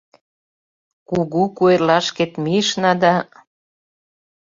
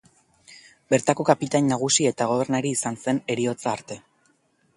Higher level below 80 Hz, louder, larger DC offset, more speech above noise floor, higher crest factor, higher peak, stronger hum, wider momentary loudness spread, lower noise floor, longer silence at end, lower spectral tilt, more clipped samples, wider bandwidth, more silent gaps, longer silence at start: first, -58 dBFS vs -66 dBFS; first, -17 LUFS vs -23 LUFS; neither; first, over 73 dB vs 42 dB; about the same, 18 dB vs 22 dB; about the same, -2 dBFS vs -2 dBFS; neither; about the same, 8 LU vs 9 LU; first, under -90 dBFS vs -65 dBFS; first, 1.2 s vs 0.8 s; about the same, -5 dB/octave vs -4 dB/octave; neither; second, 7.8 kHz vs 11.5 kHz; neither; first, 1.1 s vs 0.5 s